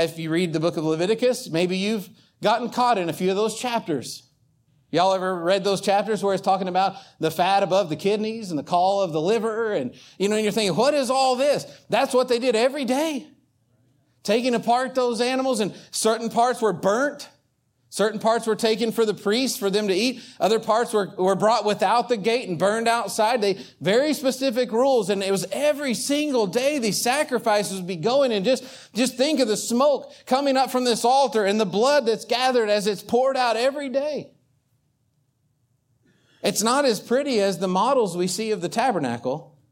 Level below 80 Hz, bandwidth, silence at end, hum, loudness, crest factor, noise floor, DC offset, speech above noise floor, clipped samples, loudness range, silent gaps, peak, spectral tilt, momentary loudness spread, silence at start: -72 dBFS; 17 kHz; 0.25 s; none; -22 LUFS; 18 dB; -69 dBFS; under 0.1%; 47 dB; under 0.1%; 3 LU; none; -6 dBFS; -4 dB/octave; 6 LU; 0 s